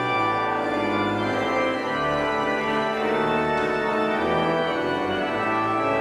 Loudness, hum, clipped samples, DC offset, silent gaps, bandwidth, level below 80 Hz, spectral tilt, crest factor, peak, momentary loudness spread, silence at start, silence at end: -23 LUFS; none; under 0.1%; under 0.1%; none; 13.5 kHz; -52 dBFS; -5.5 dB/octave; 12 dB; -10 dBFS; 2 LU; 0 s; 0 s